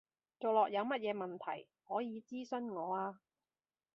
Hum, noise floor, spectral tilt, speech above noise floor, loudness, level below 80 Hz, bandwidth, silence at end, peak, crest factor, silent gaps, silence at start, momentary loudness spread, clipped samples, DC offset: none; under -90 dBFS; -3.5 dB/octave; over 51 dB; -39 LUFS; -90 dBFS; 7.2 kHz; 0.8 s; -20 dBFS; 20 dB; none; 0.4 s; 12 LU; under 0.1%; under 0.1%